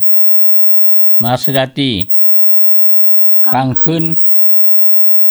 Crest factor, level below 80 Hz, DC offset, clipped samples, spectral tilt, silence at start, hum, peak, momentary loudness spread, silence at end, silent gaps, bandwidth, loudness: 8 dB; -48 dBFS; under 0.1%; under 0.1%; -6 dB/octave; 0 s; none; 0 dBFS; 7 LU; 0 s; none; over 20 kHz; -5 LUFS